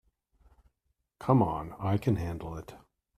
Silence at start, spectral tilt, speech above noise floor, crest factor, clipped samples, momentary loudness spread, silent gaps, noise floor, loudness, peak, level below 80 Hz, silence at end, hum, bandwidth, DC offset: 1.2 s; -9 dB/octave; 50 dB; 22 dB; under 0.1%; 16 LU; none; -79 dBFS; -30 LUFS; -10 dBFS; -54 dBFS; 0.4 s; none; 14.5 kHz; under 0.1%